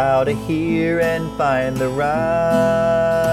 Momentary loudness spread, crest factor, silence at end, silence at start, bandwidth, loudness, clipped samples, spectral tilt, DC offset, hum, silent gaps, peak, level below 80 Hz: 4 LU; 12 dB; 0 s; 0 s; 15 kHz; -18 LUFS; under 0.1%; -6.5 dB/octave; under 0.1%; none; none; -6 dBFS; -40 dBFS